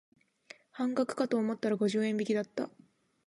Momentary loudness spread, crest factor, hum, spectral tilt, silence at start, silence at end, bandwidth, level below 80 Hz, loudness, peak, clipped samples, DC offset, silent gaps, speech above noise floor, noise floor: 9 LU; 16 dB; none; -6 dB/octave; 0.75 s; 0.6 s; 11.5 kHz; -82 dBFS; -32 LUFS; -16 dBFS; under 0.1%; under 0.1%; none; 26 dB; -57 dBFS